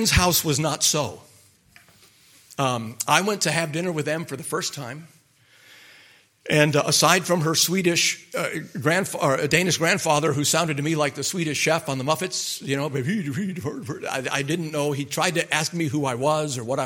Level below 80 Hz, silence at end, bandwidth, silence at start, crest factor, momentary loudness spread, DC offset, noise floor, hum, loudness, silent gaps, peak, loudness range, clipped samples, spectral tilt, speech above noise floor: -46 dBFS; 0 s; 17 kHz; 0 s; 24 dB; 10 LU; under 0.1%; -56 dBFS; none; -22 LUFS; none; 0 dBFS; 5 LU; under 0.1%; -3.5 dB/octave; 33 dB